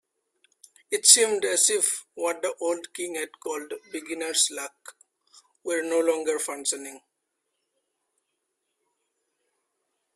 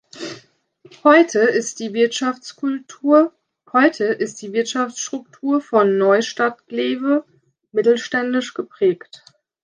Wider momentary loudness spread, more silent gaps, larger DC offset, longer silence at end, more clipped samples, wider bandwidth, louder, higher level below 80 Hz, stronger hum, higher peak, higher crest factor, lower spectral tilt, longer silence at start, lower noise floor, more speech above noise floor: first, 19 LU vs 11 LU; neither; neither; first, 3.15 s vs 0.7 s; neither; first, 16 kHz vs 10 kHz; second, -23 LUFS vs -19 LUFS; second, -78 dBFS vs -72 dBFS; neither; about the same, 0 dBFS vs -2 dBFS; first, 28 dB vs 18 dB; second, 1 dB/octave vs -4 dB/octave; first, 0.9 s vs 0.15 s; first, -80 dBFS vs -52 dBFS; first, 54 dB vs 34 dB